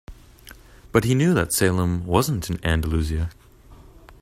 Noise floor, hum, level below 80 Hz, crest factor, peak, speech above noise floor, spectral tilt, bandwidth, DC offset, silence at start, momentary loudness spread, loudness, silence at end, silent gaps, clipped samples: -47 dBFS; none; -36 dBFS; 22 dB; -2 dBFS; 26 dB; -5.5 dB/octave; 16 kHz; under 0.1%; 0.1 s; 7 LU; -22 LUFS; 0.1 s; none; under 0.1%